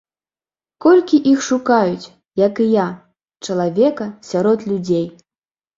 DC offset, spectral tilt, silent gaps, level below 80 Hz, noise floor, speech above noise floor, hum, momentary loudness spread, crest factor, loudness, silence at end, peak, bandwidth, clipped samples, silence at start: under 0.1%; -6 dB/octave; none; -60 dBFS; under -90 dBFS; over 74 dB; none; 14 LU; 16 dB; -17 LUFS; 0.65 s; -2 dBFS; 7.8 kHz; under 0.1%; 0.8 s